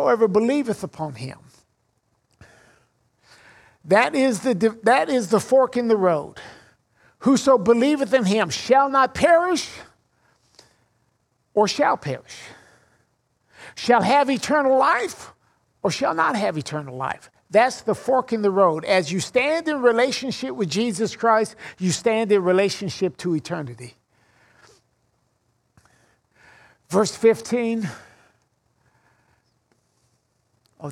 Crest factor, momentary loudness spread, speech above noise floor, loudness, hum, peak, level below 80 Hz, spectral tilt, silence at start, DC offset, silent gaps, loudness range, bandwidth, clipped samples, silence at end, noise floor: 20 dB; 14 LU; 48 dB; -20 LUFS; none; -2 dBFS; -62 dBFS; -4.5 dB/octave; 0 s; under 0.1%; none; 7 LU; 14.5 kHz; under 0.1%; 0 s; -69 dBFS